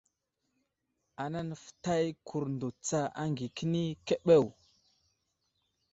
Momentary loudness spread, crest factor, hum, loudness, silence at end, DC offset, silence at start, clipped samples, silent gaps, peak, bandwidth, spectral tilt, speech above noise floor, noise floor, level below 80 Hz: 13 LU; 22 dB; none; -32 LUFS; 1.45 s; under 0.1%; 1.2 s; under 0.1%; none; -12 dBFS; 8.2 kHz; -6 dB/octave; 51 dB; -82 dBFS; -68 dBFS